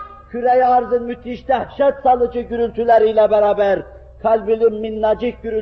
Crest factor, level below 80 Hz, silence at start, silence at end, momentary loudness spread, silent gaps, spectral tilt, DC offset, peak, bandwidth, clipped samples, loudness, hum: 14 dB; -44 dBFS; 0 s; 0 s; 9 LU; none; -4 dB/octave; under 0.1%; -4 dBFS; 6 kHz; under 0.1%; -17 LUFS; none